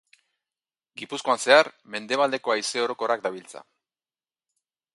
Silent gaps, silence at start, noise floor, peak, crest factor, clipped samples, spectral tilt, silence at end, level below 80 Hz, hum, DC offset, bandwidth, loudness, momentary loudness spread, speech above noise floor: none; 1 s; under -90 dBFS; -2 dBFS; 24 dB; under 0.1%; -2 dB/octave; 1.35 s; -80 dBFS; none; under 0.1%; 11.5 kHz; -23 LUFS; 22 LU; over 66 dB